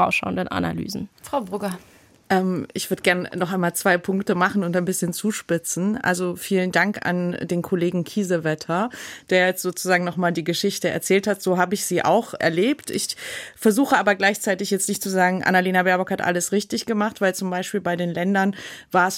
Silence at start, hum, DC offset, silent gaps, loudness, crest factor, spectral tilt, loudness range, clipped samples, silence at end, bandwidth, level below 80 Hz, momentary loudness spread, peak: 0 s; none; under 0.1%; none; -22 LUFS; 18 dB; -4.5 dB/octave; 3 LU; under 0.1%; 0 s; 16.5 kHz; -62 dBFS; 7 LU; -4 dBFS